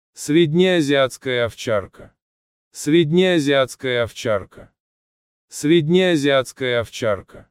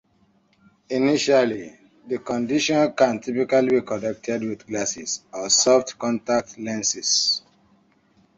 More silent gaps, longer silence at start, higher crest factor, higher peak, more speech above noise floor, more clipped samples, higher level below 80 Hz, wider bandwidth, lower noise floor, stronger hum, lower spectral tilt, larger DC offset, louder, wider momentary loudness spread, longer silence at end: first, 2.22-2.71 s, 4.80-5.48 s vs none; second, 0.2 s vs 0.9 s; about the same, 16 dB vs 18 dB; about the same, -4 dBFS vs -4 dBFS; first, over 72 dB vs 40 dB; neither; first, -56 dBFS vs -62 dBFS; first, 15 kHz vs 8.2 kHz; first, under -90 dBFS vs -62 dBFS; neither; first, -5.5 dB/octave vs -2.5 dB/octave; neither; first, -19 LUFS vs -22 LUFS; second, 8 LU vs 11 LU; second, 0.1 s vs 1 s